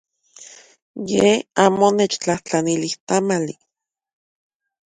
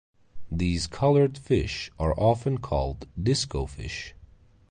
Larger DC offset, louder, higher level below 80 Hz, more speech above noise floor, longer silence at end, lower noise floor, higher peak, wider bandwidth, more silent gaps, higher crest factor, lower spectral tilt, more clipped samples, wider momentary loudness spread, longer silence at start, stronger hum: neither; first, -19 LUFS vs -27 LUFS; second, -60 dBFS vs -38 dBFS; about the same, 26 dB vs 28 dB; first, 1.45 s vs 0.45 s; second, -45 dBFS vs -54 dBFS; first, 0 dBFS vs -10 dBFS; about the same, 10.5 kHz vs 10 kHz; first, 0.82-0.94 s, 3.00-3.07 s vs none; about the same, 20 dB vs 16 dB; second, -4.5 dB/octave vs -6 dB/octave; neither; second, 9 LU vs 12 LU; about the same, 0.4 s vs 0.35 s; neither